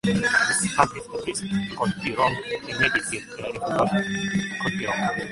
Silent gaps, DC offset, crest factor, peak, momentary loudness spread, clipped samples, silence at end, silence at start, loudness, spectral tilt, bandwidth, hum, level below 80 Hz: none; under 0.1%; 22 dB; -2 dBFS; 10 LU; under 0.1%; 0 s; 0.05 s; -24 LUFS; -4 dB/octave; 11.5 kHz; none; -52 dBFS